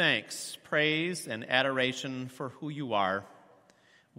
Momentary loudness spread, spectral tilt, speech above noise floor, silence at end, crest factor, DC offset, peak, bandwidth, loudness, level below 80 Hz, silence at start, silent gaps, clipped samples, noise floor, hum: 12 LU; -3.5 dB/octave; 31 dB; 0.8 s; 24 dB; under 0.1%; -10 dBFS; 16 kHz; -31 LUFS; -76 dBFS; 0 s; none; under 0.1%; -63 dBFS; none